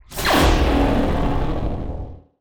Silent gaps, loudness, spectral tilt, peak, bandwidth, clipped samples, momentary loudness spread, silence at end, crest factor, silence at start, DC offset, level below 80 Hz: none; -20 LUFS; -5.5 dB/octave; -4 dBFS; over 20 kHz; under 0.1%; 15 LU; 0.2 s; 16 dB; 0.1 s; under 0.1%; -24 dBFS